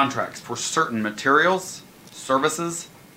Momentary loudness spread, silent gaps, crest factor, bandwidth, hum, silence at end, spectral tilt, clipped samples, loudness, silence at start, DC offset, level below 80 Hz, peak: 18 LU; none; 20 dB; 16 kHz; none; 0.2 s; -3 dB/octave; under 0.1%; -22 LUFS; 0 s; under 0.1%; -66 dBFS; -4 dBFS